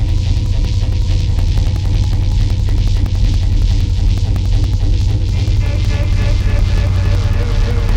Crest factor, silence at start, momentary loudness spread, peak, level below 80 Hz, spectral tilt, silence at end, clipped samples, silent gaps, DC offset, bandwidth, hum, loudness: 8 dB; 0 s; 1 LU; -4 dBFS; -14 dBFS; -6.5 dB/octave; 0 s; under 0.1%; none; under 0.1%; 9 kHz; none; -16 LUFS